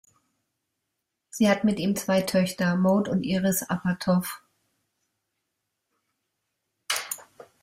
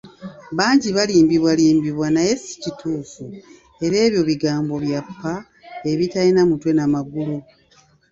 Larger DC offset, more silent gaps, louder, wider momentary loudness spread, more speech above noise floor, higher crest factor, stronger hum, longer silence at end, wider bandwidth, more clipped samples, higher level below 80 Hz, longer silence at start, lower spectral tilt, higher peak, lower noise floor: neither; neither; second, -25 LUFS vs -19 LUFS; second, 13 LU vs 16 LU; first, 58 dB vs 37 dB; about the same, 18 dB vs 18 dB; neither; second, 0.4 s vs 0.7 s; first, 16 kHz vs 7.8 kHz; neither; second, -64 dBFS vs -54 dBFS; first, 1.35 s vs 0.05 s; about the same, -5 dB/octave vs -5.5 dB/octave; second, -10 dBFS vs -2 dBFS; first, -82 dBFS vs -55 dBFS